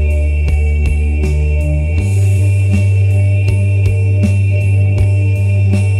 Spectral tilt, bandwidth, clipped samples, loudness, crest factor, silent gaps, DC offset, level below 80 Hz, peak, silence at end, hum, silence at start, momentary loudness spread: -8 dB/octave; 11 kHz; under 0.1%; -13 LUFS; 10 dB; none; 0.1%; -20 dBFS; 0 dBFS; 0 s; none; 0 s; 3 LU